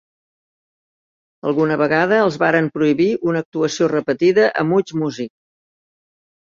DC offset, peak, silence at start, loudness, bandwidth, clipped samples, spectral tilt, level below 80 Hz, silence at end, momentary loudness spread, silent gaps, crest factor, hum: under 0.1%; -2 dBFS; 1.45 s; -17 LUFS; 7.6 kHz; under 0.1%; -6 dB/octave; -62 dBFS; 1.3 s; 8 LU; 3.46-3.52 s; 18 dB; none